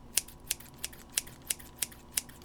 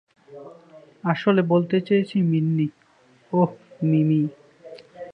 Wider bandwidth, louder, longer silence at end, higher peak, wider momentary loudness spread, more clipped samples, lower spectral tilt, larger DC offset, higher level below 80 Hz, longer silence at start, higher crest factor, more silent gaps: first, over 20 kHz vs 5.6 kHz; second, -36 LUFS vs -22 LUFS; about the same, 0 s vs 0 s; about the same, -2 dBFS vs -4 dBFS; second, 5 LU vs 21 LU; neither; second, 0 dB/octave vs -9.5 dB/octave; neither; first, -56 dBFS vs -68 dBFS; second, 0 s vs 0.3 s; first, 36 dB vs 18 dB; neither